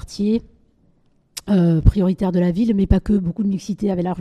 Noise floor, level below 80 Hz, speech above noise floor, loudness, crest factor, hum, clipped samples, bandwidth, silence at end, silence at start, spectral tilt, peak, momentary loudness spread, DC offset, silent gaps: -58 dBFS; -28 dBFS; 41 dB; -19 LUFS; 18 dB; none; under 0.1%; 12.5 kHz; 0 s; 0 s; -8 dB/octave; 0 dBFS; 7 LU; under 0.1%; none